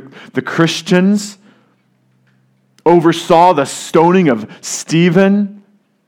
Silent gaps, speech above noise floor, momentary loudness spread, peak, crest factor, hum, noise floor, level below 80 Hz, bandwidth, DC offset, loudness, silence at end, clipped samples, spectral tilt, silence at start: none; 45 dB; 13 LU; 0 dBFS; 14 dB; none; -57 dBFS; -56 dBFS; 15 kHz; under 0.1%; -13 LUFS; 0.5 s; 0.3%; -5.5 dB/octave; 0.05 s